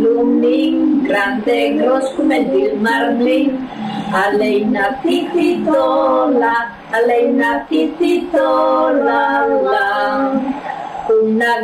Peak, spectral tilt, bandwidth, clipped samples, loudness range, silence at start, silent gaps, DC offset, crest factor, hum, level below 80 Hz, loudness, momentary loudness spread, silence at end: -4 dBFS; -5.5 dB/octave; 14.5 kHz; under 0.1%; 1 LU; 0 s; none; under 0.1%; 10 dB; none; -52 dBFS; -15 LUFS; 5 LU; 0 s